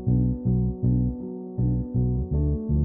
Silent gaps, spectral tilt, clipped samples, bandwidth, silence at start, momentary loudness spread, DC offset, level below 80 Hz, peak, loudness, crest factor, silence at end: none; -16 dB/octave; under 0.1%; 1.2 kHz; 0 s; 5 LU; under 0.1%; -30 dBFS; -12 dBFS; -26 LUFS; 12 dB; 0 s